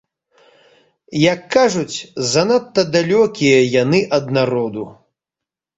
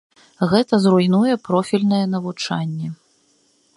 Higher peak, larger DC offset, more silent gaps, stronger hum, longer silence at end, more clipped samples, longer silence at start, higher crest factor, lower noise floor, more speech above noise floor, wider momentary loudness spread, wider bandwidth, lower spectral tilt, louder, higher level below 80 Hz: about the same, -2 dBFS vs -2 dBFS; neither; neither; neither; about the same, 0.85 s vs 0.8 s; neither; first, 1.1 s vs 0.4 s; about the same, 16 dB vs 18 dB; first, -86 dBFS vs -60 dBFS; first, 70 dB vs 42 dB; about the same, 11 LU vs 10 LU; second, 8 kHz vs 11.5 kHz; second, -5 dB/octave vs -6.5 dB/octave; first, -16 LUFS vs -19 LUFS; about the same, -56 dBFS vs -60 dBFS